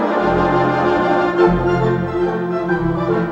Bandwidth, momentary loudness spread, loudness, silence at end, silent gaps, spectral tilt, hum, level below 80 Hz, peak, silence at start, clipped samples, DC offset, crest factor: 7.4 kHz; 5 LU; -17 LUFS; 0 s; none; -8.5 dB/octave; none; -36 dBFS; 0 dBFS; 0 s; under 0.1%; under 0.1%; 16 dB